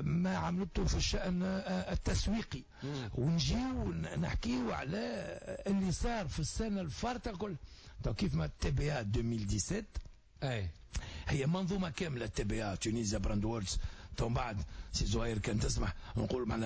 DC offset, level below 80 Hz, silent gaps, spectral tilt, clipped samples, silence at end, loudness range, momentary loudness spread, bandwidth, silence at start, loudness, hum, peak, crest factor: under 0.1%; -44 dBFS; none; -5.5 dB/octave; under 0.1%; 0 s; 2 LU; 8 LU; 8 kHz; 0 s; -37 LUFS; none; -22 dBFS; 14 dB